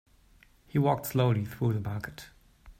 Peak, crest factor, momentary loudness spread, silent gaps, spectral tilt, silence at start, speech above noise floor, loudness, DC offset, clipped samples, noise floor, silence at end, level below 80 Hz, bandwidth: -12 dBFS; 18 dB; 13 LU; none; -7 dB/octave; 0.75 s; 32 dB; -29 LUFS; under 0.1%; under 0.1%; -61 dBFS; 0.1 s; -58 dBFS; 16 kHz